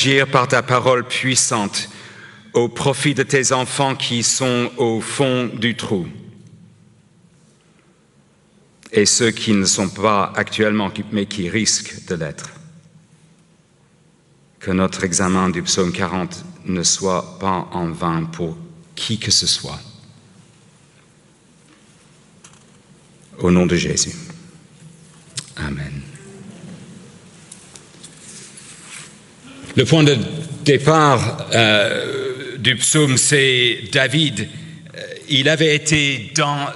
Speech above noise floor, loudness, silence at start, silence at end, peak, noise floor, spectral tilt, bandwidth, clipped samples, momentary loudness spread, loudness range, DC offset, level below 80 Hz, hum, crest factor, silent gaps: 37 dB; -17 LUFS; 0 s; 0 s; 0 dBFS; -54 dBFS; -3.5 dB/octave; 12 kHz; under 0.1%; 22 LU; 14 LU; under 0.1%; -50 dBFS; none; 20 dB; none